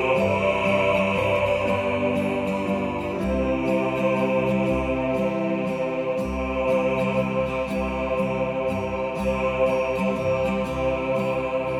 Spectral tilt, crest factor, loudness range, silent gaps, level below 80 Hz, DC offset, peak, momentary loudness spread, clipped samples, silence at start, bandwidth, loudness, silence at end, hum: -7 dB/octave; 14 dB; 2 LU; none; -40 dBFS; under 0.1%; -10 dBFS; 5 LU; under 0.1%; 0 s; 14 kHz; -24 LUFS; 0 s; none